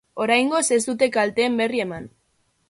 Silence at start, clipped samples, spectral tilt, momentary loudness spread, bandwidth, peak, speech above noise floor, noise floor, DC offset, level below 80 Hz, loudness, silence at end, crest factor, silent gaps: 0.15 s; under 0.1%; -3 dB/octave; 8 LU; 11.5 kHz; -4 dBFS; 46 dB; -67 dBFS; under 0.1%; -62 dBFS; -21 LUFS; 0.65 s; 18 dB; none